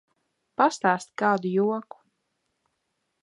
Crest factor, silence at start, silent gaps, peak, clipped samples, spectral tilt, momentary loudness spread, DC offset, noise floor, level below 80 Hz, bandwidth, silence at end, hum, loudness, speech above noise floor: 22 dB; 0.6 s; none; -6 dBFS; under 0.1%; -5.5 dB/octave; 8 LU; under 0.1%; -78 dBFS; -80 dBFS; 11.5 kHz; 1.4 s; none; -25 LUFS; 54 dB